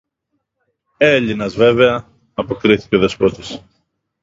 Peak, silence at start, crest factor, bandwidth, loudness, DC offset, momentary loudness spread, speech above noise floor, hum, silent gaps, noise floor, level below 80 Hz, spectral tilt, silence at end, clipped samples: 0 dBFS; 1 s; 16 dB; 7.8 kHz; -15 LUFS; under 0.1%; 17 LU; 58 dB; none; none; -72 dBFS; -46 dBFS; -6 dB/octave; 0.65 s; under 0.1%